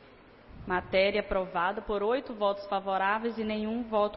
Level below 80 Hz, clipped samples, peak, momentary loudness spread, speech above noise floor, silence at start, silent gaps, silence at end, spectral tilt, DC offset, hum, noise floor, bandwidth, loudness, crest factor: -52 dBFS; under 0.1%; -14 dBFS; 6 LU; 25 dB; 0 s; none; 0 s; -9 dB/octave; under 0.1%; none; -54 dBFS; 5.8 kHz; -30 LUFS; 16 dB